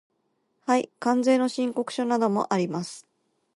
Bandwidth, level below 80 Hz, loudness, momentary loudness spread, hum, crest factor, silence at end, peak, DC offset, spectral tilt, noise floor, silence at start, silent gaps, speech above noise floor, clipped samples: 11.5 kHz; -76 dBFS; -25 LUFS; 13 LU; none; 16 dB; 0.55 s; -10 dBFS; under 0.1%; -5.5 dB/octave; -73 dBFS; 0.65 s; none; 49 dB; under 0.1%